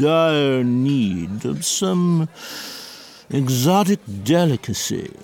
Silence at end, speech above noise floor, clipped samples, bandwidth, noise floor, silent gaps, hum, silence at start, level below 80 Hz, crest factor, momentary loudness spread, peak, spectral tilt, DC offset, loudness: 0.15 s; 21 dB; under 0.1%; 17.5 kHz; -40 dBFS; none; none; 0 s; -56 dBFS; 14 dB; 14 LU; -6 dBFS; -5 dB/octave; under 0.1%; -19 LUFS